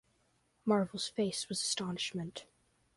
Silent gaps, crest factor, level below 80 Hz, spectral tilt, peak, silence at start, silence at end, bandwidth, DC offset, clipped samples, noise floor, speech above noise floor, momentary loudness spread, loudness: none; 20 dB; -74 dBFS; -4 dB/octave; -18 dBFS; 0.65 s; 0.55 s; 11.5 kHz; under 0.1%; under 0.1%; -74 dBFS; 39 dB; 10 LU; -35 LUFS